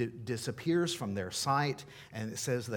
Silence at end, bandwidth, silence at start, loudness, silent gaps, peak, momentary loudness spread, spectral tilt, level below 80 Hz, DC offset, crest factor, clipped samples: 0 s; 18 kHz; 0 s; -34 LUFS; none; -16 dBFS; 10 LU; -4.5 dB/octave; -70 dBFS; under 0.1%; 18 dB; under 0.1%